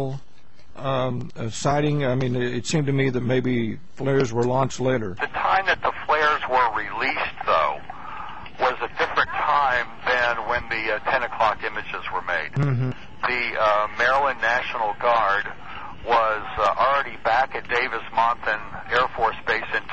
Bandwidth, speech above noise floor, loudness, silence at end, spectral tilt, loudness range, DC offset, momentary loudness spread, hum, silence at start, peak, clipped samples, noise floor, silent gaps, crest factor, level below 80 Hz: 8.4 kHz; 30 dB; -23 LUFS; 0 s; -5.5 dB/octave; 2 LU; 1%; 9 LU; none; 0 s; -8 dBFS; under 0.1%; -53 dBFS; none; 16 dB; -50 dBFS